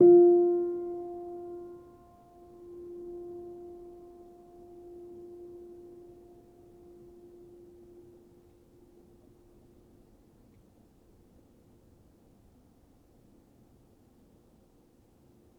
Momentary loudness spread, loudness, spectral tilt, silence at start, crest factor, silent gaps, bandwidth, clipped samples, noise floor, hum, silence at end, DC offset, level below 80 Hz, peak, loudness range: 27 LU; -28 LUFS; -10.5 dB/octave; 0 s; 22 dB; none; 1.5 kHz; under 0.1%; -63 dBFS; none; 11.9 s; under 0.1%; -68 dBFS; -10 dBFS; 21 LU